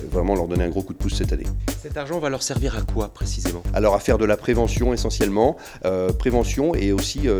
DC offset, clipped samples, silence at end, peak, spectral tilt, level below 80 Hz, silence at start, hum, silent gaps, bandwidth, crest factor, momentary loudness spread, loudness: under 0.1%; under 0.1%; 0 s; -4 dBFS; -5.5 dB/octave; -28 dBFS; 0 s; none; none; over 20 kHz; 16 dB; 8 LU; -22 LUFS